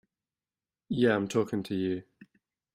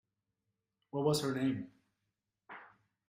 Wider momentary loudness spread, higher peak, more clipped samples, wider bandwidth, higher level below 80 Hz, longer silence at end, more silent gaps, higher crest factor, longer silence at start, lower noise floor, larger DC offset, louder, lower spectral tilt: second, 9 LU vs 21 LU; first, -12 dBFS vs -20 dBFS; neither; about the same, 16 kHz vs 15.5 kHz; first, -68 dBFS vs -74 dBFS; first, 0.75 s vs 0.4 s; neither; about the same, 20 dB vs 20 dB; about the same, 0.9 s vs 0.95 s; about the same, under -90 dBFS vs -87 dBFS; neither; first, -30 LUFS vs -35 LUFS; about the same, -6.5 dB/octave vs -5.5 dB/octave